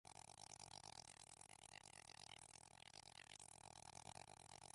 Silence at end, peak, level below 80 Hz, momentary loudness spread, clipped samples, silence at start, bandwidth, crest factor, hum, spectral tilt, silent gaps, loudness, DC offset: 0 s; -42 dBFS; -82 dBFS; 4 LU; under 0.1%; 0.05 s; 11.5 kHz; 22 dB; none; -1.5 dB/octave; none; -60 LUFS; under 0.1%